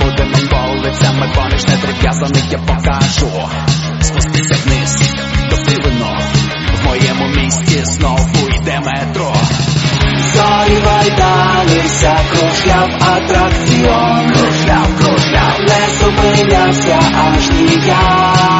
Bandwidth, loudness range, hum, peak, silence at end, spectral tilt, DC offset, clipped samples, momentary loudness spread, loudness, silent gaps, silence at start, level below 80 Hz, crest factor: 8.2 kHz; 3 LU; none; 0 dBFS; 0 s; -4.5 dB/octave; under 0.1%; under 0.1%; 5 LU; -11 LUFS; none; 0 s; -20 dBFS; 10 dB